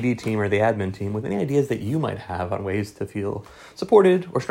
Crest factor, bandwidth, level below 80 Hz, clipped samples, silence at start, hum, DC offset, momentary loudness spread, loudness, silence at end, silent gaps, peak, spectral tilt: 20 dB; 16 kHz; -54 dBFS; under 0.1%; 0 s; none; under 0.1%; 13 LU; -23 LUFS; 0 s; none; -2 dBFS; -7.5 dB/octave